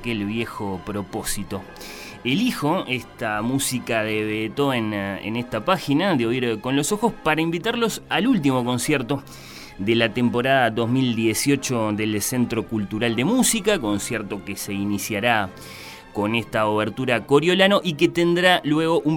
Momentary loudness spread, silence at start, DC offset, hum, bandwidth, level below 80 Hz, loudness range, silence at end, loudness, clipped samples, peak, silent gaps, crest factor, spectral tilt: 11 LU; 0 s; under 0.1%; none; 18 kHz; -48 dBFS; 4 LU; 0 s; -22 LUFS; under 0.1%; -2 dBFS; none; 20 dB; -4.5 dB/octave